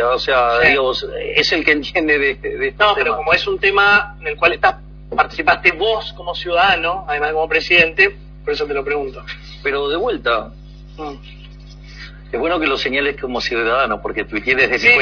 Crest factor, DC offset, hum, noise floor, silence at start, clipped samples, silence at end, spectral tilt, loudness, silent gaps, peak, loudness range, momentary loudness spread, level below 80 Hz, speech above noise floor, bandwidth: 18 dB; under 0.1%; none; -36 dBFS; 0 s; under 0.1%; 0 s; -4 dB/octave; -16 LUFS; none; 0 dBFS; 7 LU; 15 LU; -38 dBFS; 19 dB; 5.4 kHz